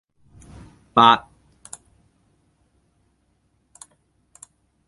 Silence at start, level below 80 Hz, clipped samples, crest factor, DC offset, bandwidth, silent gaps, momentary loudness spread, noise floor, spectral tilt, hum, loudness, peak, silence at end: 0.95 s; -58 dBFS; under 0.1%; 26 dB; under 0.1%; 11.5 kHz; none; 27 LU; -66 dBFS; -4 dB/octave; none; -16 LUFS; 0 dBFS; 3.7 s